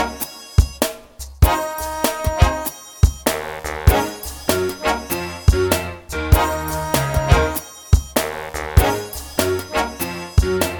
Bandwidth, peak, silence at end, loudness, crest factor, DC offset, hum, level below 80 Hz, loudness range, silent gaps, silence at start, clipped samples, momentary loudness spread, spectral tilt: over 20 kHz; 0 dBFS; 0 s; -20 LUFS; 18 dB; under 0.1%; none; -24 dBFS; 1 LU; none; 0 s; under 0.1%; 9 LU; -5 dB/octave